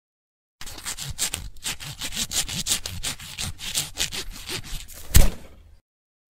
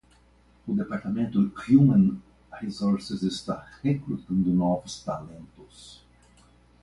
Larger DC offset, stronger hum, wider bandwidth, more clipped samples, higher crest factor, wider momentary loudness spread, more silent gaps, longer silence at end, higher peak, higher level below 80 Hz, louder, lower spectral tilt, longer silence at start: neither; second, none vs 60 Hz at -50 dBFS; first, 16.5 kHz vs 11.5 kHz; neither; first, 26 dB vs 20 dB; second, 13 LU vs 21 LU; neither; about the same, 0.8 s vs 0.9 s; first, 0 dBFS vs -6 dBFS; first, -30 dBFS vs -56 dBFS; about the same, -27 LUFS vs -26 LUFS; second, -2 dB/octave vs -7.5 dB/octave; about the same, 0.6 s vs 0.65 s